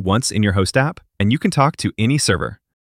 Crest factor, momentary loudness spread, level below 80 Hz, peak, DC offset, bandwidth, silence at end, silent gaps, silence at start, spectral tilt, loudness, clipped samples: 16 dB; 6 LU; -44 dBFS; -2 dBFS; under 0.1%; 16 kHz; 0.3 s; none; 0 s; -5 dB/octave; -18 LUFS; under 0.1%